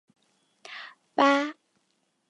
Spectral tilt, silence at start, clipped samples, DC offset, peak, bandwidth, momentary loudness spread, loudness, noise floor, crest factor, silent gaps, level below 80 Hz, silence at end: -3 dB/octave; 0.7 s; under 0.1%; under 0.1%; -8 dBFS; 11.5 kHz; 20 LU; -25 LUFS; -74 dBFS; 22 dB; none; -86 dBFS; 0.8 s